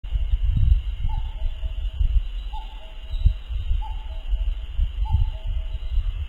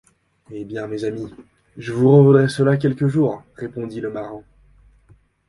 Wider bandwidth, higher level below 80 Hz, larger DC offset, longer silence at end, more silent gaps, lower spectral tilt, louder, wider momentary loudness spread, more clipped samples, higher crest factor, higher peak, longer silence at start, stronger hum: second, 4.2 kHz vs 11.5 kHz; first, -24 dBFS vs -56 dBFS; neither; second, 0 s vs 1.1 s; neither; about the same, -7.5 dB/octave vs -8.5 dB/octave; second, -28 LUFS vs -18 LUFS; second, 12 LU vs 22 LU; neither; about the same, 18 dB vs 20 dB; second, -4 dBFS vs 0 dBFS; second, 0.05 s vs 0.5 s; neither